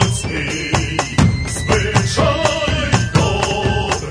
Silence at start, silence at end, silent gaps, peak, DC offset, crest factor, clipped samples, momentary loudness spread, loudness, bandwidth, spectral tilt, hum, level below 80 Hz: 0 s; 0 s; none; 0 dBFS; under 0.1%; 16 dB; under 0.1%; 4 LU; -17 LUFS; 11 kHz; -4.5 dB/octave; none; -28 dBFS